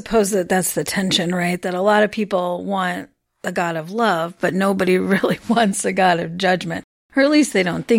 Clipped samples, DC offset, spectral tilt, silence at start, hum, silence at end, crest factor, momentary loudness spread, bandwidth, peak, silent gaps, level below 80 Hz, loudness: under 0.1%; under 0.1%; -4.5 dB/octave; 0.05 s; none; 0 s; 14 dB; 7 LU; 16.5 kHz; -4 dBFS; 6.84-7.10 s; -52 dBFS; -19 LUFS